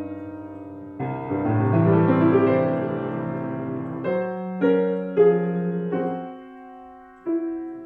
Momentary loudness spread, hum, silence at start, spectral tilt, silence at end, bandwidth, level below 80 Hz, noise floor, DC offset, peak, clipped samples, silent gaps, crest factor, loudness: 19 LU; none; 0 s; -11.5 dB/octave; 0 s; 4.3 kHz; -62 dBFS; -44 dBFS; under 0.1%; -6 dBFS; under 0.1%; none; 16 dB; -23 LUFS